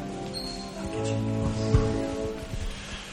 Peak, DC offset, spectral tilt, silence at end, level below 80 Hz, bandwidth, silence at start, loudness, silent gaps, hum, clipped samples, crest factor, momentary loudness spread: -10 dBFS; under 0.1%; -6 dB/octave; 0 s; -36 dBFS; 13.5 kHz; 0 s; -30 LUFS; none; none; under 0.1%; 20 dB; 11 LU